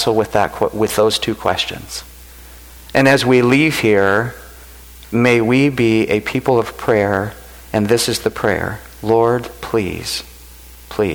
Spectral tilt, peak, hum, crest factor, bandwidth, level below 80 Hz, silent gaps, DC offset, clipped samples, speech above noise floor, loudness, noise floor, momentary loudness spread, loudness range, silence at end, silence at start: -5 dB/octave; -2 dBFS; none; 16 dB; over 20 kHz; -42 dBFS; none; under 0.1%; under 0.1%; 23 dB; -16 LUFS; -39 dBFS; 13 LU; 4 LU; 0 s; 0 s